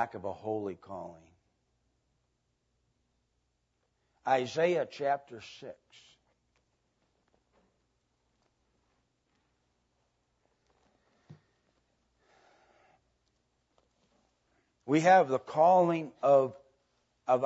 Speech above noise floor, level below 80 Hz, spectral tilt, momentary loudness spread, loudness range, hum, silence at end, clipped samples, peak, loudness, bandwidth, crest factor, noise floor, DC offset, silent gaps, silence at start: 50 dB; -80 dBFS; -6 dB/octave; 23 LU; 17 LU; 60 Hz at -80 dBFS; 0 s; under 0.1%; -12 dBFS; -28 LUFS; 8 kHz; 22 dB; -78 dBFS; under 0.1%; none; 0 s